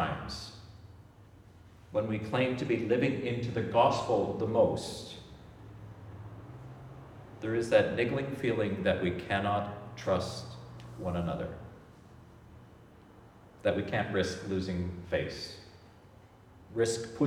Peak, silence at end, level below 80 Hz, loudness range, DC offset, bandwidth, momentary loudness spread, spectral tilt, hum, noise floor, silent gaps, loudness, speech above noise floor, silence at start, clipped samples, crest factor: -10 dBFS; 0 s; -58 dBFS; 8 LU; under 0.1%; 14 kHz; 22 LU; -6 dB/octave; none; -56 dBFS; none; -32 LUFS; 25 dB; 0 s; under 0.1%; 22 dB